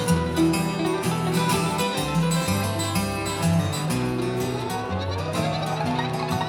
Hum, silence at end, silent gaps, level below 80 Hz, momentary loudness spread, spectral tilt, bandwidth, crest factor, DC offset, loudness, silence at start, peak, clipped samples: none; 0 s; none; -46 dBFS; 5 LU; -5 dB/octave; 18 kHz; 16 dB; under 0.1%; -24 LUFS; 0 s; -8 dBFS; under 0.1%